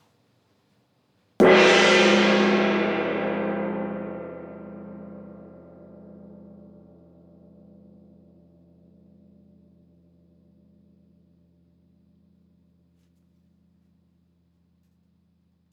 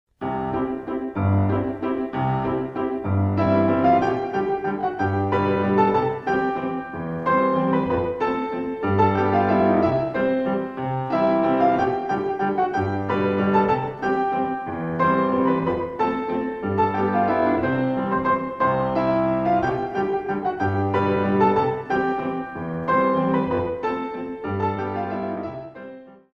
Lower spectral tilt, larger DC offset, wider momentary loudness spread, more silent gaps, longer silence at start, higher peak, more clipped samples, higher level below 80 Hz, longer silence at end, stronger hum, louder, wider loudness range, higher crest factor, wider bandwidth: second, -4.5 dB/octave vs -9 dB/octave; neither; first, 29 LU vs 8 LU; neither; first, 1.4 s vs 0.2 s; about the same, -6 dBFS vs -6 dBFS; neither; second, -64 dBFS vs -50 dBFS; first, 10.35 s vs 0.2 s; neither; first, -19 LUFS vs -22 LUFS; first, 25 LU vs 3 LU; first, 22 dB vs 16 dB; first, 10 kHz vs 6.6 kHz